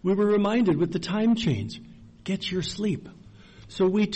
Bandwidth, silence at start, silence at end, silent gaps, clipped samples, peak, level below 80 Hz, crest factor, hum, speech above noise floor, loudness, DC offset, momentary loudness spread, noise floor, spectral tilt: 8.4 kHz; 0.05 s; 0 s; none; under 0.1%; -14 dBFS; -54 dBFS; 12 dB; none; 24 dB; -25 LUFS; under 0.1%; 15 LU; -48 dBFS; -6.5 dB/octave